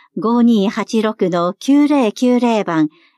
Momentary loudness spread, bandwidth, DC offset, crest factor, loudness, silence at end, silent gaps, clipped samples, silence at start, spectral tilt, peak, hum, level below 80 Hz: 5 LU; 12 kHz; under 0.1%; 12 dB; -15 LUFS; 0.3 s; none; under 0.1%; 0.15 s; -6 dB/octave; -4 dBFS; none; -68 dBFS